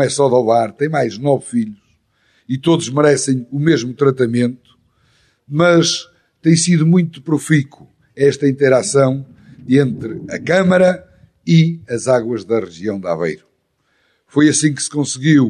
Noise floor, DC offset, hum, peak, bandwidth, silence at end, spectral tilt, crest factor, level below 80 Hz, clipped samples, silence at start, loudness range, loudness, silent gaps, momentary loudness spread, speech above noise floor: -64 dBFS; under 0.1%; none; -2 dBFS; 11 kHz; 0 s; -5.5 dB/octave; 14 dB; -58 dBFS; under 0.1%; 0 s; 3 LU; -15 LUFS; none; 11 LU; 49 dB